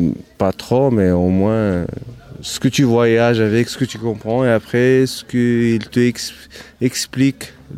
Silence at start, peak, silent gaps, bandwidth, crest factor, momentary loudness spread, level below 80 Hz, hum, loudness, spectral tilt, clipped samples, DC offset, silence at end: 0 s; -2 dBFS; none; 16 kHz; 14 dB; 13 LU; -46 dBFS; none; -16 LUFS; -6 dB/octave; under 0.1%; under 0.1%; 0 s